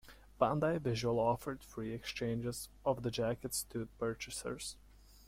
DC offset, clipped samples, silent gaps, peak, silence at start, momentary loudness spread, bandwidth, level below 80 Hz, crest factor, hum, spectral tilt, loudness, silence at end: under 0.1%; under 0.1%; none; -16 dBFS; 0.05 s; 10 LU; 16.5 kHz; -60 dBFS; 22 dB; none; -5 dB/octave; -38 LUFS; 0.05 s